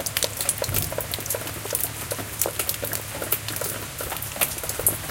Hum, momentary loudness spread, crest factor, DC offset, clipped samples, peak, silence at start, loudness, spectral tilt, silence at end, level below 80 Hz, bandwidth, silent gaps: none; 6 LU; 26 dB; under 0.1%; under 0.1%; -2 dBFS; 0 s; -25 LUFS; -2 dB/octave; 0 s; -46 dBFS; 17.5 kHz; none